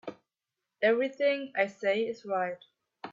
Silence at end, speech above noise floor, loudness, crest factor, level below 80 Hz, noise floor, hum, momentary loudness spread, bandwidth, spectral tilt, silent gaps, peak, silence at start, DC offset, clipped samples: 0 s; 59 dB; -30 LUFS; 20 dB; -82 dBFS; -88 dBFS; none; 17 LU; 7.4 kHz; -5 dB/octave; none; -12 dBFS; 0.05 s; under 0.1%; under 0.1%